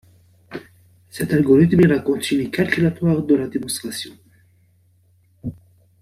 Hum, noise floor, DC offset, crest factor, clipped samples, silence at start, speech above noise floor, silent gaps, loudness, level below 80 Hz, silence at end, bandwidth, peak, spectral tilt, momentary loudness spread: none; -57 dBFS; under 0.1%; 18 dB; under 0.1%; 0.5 s; 40 dB; none; -18 LUFS; -52 dBFS; 0.5 s; 15 kHz; -4 dBFS; -6.5 dB/octave; 23 LU